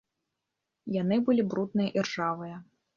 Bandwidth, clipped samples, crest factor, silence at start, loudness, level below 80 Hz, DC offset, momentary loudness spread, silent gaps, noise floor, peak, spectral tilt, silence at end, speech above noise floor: 7.4 kHz; under 0.1%; 16 dB; 0.85 s; -29 LUFS; -72 dBFS; under 0.1%; 17 LU; none; -85 dBFS; -14 dBFS; -6.5 dB/octave; 0.35 s; 57 dB